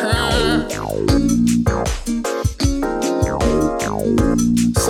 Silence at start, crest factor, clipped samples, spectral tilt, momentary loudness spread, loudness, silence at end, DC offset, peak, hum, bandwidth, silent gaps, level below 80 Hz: 0 s; 14 dB; under 0.1%; -5 dB/octave; 6 LU; -18 LUFS; 0 s; under 0.1%; -2 dBFS; none; 17 kHz; none; -26 dBFS